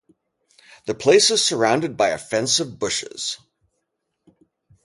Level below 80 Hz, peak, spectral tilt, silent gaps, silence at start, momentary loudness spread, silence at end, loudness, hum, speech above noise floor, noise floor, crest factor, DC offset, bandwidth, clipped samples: -62 dBFS; -4 dBFS; -2.5 dB/octave; none; 0.85 s; 14 LU; 1.5 s; -19 LUFS; none; 56 dB; -76 dBFS; 18 dB; under 0.1%; 11.5 kHz; under 0.1%